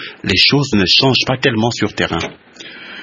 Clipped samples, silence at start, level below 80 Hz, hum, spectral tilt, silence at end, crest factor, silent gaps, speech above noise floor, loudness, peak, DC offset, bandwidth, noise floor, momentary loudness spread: under 0.1%; 0 s; -44 dBFS; none; -4.5 dB/octave; 0 s; 16 dB; none; 20 dB; -13 LUFS; 0 dBFS; under 0.1%; 11 kHz; -34 dBFS; 18 LU